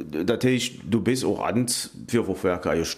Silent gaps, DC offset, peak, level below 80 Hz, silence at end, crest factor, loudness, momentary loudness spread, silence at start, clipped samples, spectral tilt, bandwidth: none; under 0.1%; -8 dBFS; -52 dBFS; 0 s; 16 dB; -25 LUFS; 4 LU; 0 s; under 0.1%; -4.5 dB/octave; 15.5 kHz